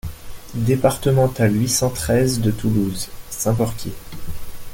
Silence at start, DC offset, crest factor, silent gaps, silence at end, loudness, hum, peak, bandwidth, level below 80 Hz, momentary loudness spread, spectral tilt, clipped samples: 0.05 s; under 0.1%; 16 dB; none; 0 s; -19 LUFS; none; -2 dBFS; 17 kHz; -38 dBFS; 18 LU; -5.5 dB/octave; under 0.1%